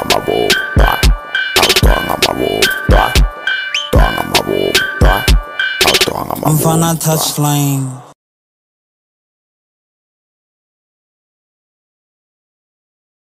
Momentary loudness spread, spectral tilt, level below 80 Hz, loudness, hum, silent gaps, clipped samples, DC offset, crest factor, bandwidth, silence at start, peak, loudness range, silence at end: 6 LU; -3.5 dB/octave; -20 dBFS; -12 LUFS; none; none; under 0.1%; under 0.1%; 14 dB; 16 kHz; 0 s; 0 dBFS; 7 LU; 5.2 s